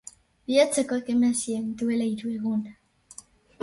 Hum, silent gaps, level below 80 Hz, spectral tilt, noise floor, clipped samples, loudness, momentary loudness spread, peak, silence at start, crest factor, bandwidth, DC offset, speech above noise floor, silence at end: none; none; -64 dBFS; -4 dB/octave; -50 dBFS; under 0.1%; -26 LUFS; 24 LU; -8 dBFS; 0.5 s; 18 dB; 11.5 kHz; under 0.1%; 25 dB; 0.9 s